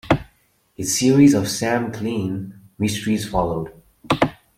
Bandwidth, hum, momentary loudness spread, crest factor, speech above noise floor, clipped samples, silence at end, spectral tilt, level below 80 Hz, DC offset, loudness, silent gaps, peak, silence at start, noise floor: 15.5 kHz; none; 15 LU; 18 dB; 40 dB; under 0.1%; 0.25 s; -5 dB/octave; -44 dBFS; under 0.1%; -20 LUFS; none; -2 dBFS; 0.05 s; -59 dBFS